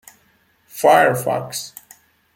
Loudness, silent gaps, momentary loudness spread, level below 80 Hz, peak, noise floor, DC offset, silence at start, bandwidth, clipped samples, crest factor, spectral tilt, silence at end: -17 LUFS; none; 20 LU; -64 dBFS; -2 dBFS; -59 dBFS; under 0.1%; 0.75 s; 17 kHz; under 0.1%; 18 dB; -4 dB/octave; 0.7 s